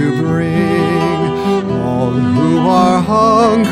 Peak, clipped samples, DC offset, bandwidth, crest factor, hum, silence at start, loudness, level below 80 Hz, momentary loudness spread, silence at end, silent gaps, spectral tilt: 0 dBFS; under 0.1%; under 0.1%; 13 kHz; 12 dB; none; 0 s; -13 LUFS; -40 dBFS; 5 LU; 0 s; none; -7 dB/octave